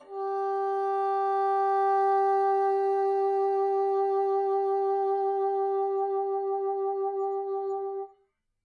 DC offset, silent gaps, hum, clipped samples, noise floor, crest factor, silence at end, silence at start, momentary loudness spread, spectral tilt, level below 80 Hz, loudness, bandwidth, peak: under 0.1%; none; none; under 0.1%; -71 dBFS; 8 dB; 0.6 s; 0 s; 7 LU; -5 dB/octave; -82 dBFS; -27 LUFS; 4.9 kHz; -18 dBFS